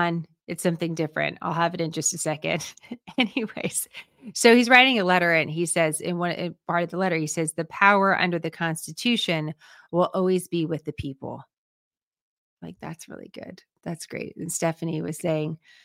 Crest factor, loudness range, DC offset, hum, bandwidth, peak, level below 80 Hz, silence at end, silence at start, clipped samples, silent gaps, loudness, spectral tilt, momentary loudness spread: 24 dB; 14 LU; under 0.1%; none; 16.5 kHz; -2 dBFS; -62 dBFS; 0.3 s; 0 s; under 0.1%; 11.58-11.91 s, 12.03-12.11 s, 12.21-12.57 s; -23 LUFS; -4 dB/octave; 20 LU